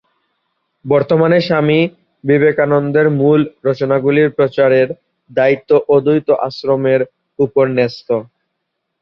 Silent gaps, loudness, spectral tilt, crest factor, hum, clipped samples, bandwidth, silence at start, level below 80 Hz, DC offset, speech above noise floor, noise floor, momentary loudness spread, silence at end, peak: none; -14 LUFS; -9 dB/octave; 14 dB; none; under 0.1%; 6 kHz; 0.85 s; -56 dBFS; under 0.1%; 60 dB; -73 dBFS; 8 LU; 0.8 s; 0 dBFS